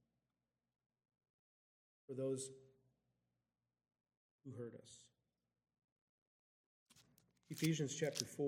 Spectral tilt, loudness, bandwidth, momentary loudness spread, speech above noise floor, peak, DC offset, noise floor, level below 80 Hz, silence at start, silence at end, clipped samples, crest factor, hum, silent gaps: -4.5 dB/octave; -44 LUFS; 15.5 kHz; 22 LU; over 47 dB; -18 dBFS; under 0.1%; under -90 dBFS; -90 dBFS; 2.1 s; 0 s; under 0.1%; 32 dB; 60 Hz at -85 dBFS; 4.17-4.39 s, 5.84-6.86 s